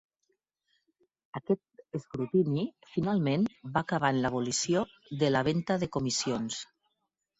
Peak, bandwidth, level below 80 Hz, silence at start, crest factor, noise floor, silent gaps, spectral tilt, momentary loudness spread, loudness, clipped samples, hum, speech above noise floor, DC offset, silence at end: -12 dBFS; 8.4 kHz; -62 dBFS; 1.35 s; 20 dB; -82 dBFS; none; -5 dB/octave; 11 LU; -30 LUFS; under 0.1%; none; 52 dB; under 0.1%; 0.75 s